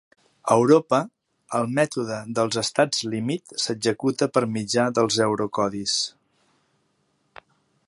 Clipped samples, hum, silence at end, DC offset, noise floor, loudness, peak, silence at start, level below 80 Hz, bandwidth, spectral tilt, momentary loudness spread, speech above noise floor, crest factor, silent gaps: under 0.1%; none; 1.8 s; under 0.1%; -69 dBFS; -23 LUFS; -4 dBFS; 0.45 s; -64 dBFS; 11.5 kHz; -4 dB/octave; 9 LU; 47 dB; 20 dB; none